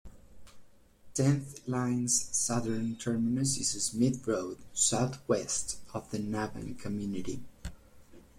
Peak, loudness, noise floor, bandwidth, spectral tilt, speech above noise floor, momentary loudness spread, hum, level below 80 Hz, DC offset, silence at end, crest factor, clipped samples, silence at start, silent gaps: -14 dBFS; -31 LUFS; -56 dBFS; 16 kHz; -4.5 dB/octave; 24 dB; 12 LU; none; -56 dBFS; under 0.1%; 0.15 s; 20 dB; under 0.1%; 0.05 s; none